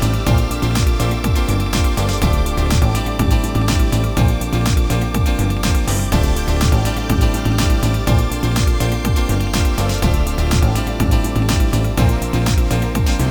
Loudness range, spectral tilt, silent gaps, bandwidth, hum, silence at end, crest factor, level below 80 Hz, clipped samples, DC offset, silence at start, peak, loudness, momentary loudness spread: 0 LU; -5.5 dB/octave; none; over 20 kHz; none; 0 s; 12 dB; -18 dBFS; under 0.1%; 0.4%; 0 s; -2 dBFS; -17 LUFS; 2 LU